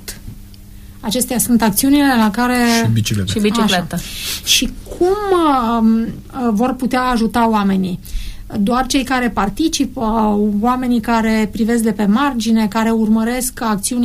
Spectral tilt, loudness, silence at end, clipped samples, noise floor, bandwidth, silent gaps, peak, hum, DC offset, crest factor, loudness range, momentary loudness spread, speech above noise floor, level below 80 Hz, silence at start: -4.5 dB/octave; -15 LUFS; 0 s; under 0.1%; -36 dBFS; 15.5 kHz; none; -2 dBFS; none; under 0.1%; 14 dB; 2 LU; 8 LU; 21 dB; -34 dBFS; 0 s